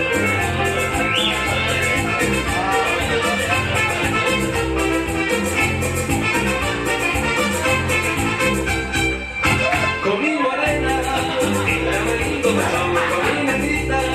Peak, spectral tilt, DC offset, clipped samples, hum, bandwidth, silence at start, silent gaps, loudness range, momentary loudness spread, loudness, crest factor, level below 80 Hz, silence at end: -4 dBFS; -4 dB/octave; under 0.1%; under 0.1%; none; 16 kHz; 0 s; none; 1 LU; 2 LU; -18 LUFS; 14 dB; -34 dBFS; 0 s